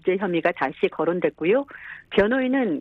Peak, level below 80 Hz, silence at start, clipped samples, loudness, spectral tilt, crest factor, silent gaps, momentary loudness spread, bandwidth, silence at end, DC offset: -8 dBFS; -56 dBFS; 0.05 s; under 0.1%; -23 LUFS; -8 dB/octave; 16 dB; none; 4 LU; 5.6 kHz; 0 s; under 0.1%